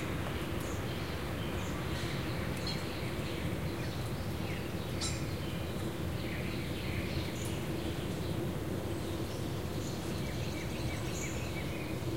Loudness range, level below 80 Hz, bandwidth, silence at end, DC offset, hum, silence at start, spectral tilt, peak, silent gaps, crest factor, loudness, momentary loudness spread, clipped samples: 0 LU; -48 dBFS; 16 kHz; 0 s; 0.4%; none; 0 s; -5.5 dB/octave; -22 dBFS; none; 16 dB; -37 LUFS; 2 LU; under 0.1%